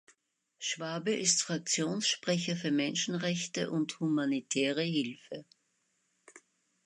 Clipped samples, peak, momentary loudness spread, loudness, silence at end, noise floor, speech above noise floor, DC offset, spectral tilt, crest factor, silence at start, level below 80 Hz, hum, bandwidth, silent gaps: under 0.1%; -14 dBFS; 8 LU; -32 LUFS; 0.5 s; -77 dBFS; 44 dB; under 0.1%; -3 dB/octave; 20 dB; 0.6 s; -82 dBFS; none; 11 kHz; none